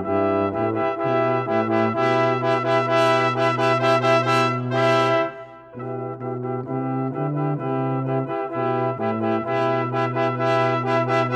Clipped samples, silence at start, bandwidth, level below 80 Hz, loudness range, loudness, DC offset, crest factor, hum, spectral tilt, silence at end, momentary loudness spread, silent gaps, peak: under 0.1%; 0 s; 12 kHz; -66 dBFS; 6 LU; -21 LUFS; under 0.1%; 16 dB; none; -6.5 dB/octave; 0 s; 9 LU; none; -4 dBFS